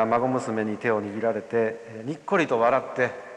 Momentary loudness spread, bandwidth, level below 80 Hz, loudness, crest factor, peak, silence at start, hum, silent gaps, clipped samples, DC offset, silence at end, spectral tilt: 8 LU; 10.5 kHz; -70 dBFS; -25 LUFS; 16 dB; -8 dBFS; 0 s; none; none; under 0.1%; under 0.1%; 0 s; -6.5 dB/octave